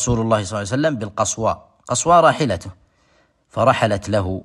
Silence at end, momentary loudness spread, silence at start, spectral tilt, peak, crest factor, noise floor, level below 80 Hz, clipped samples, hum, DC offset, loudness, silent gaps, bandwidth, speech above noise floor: 0 s; 12 LU; 0 s; -4.5 dB/octave; -2 dBFS; 18 dB; -59 dBFS; -44 dBFS; under 0.1%; none; under 0.1%; -18 LUFS; none; 12 kHz; 41 dB